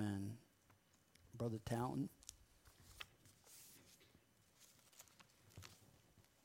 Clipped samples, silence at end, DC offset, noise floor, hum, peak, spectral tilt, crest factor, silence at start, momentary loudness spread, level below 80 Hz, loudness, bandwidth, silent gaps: under 0.1%; 0.25 s; under 0.1%; -74 dBFS; none; -30 dBFS; -6 dB/octave; 22 dB; 0 s; 23 LU; -74 dBFS; -49 LUFS; 16 kHz; none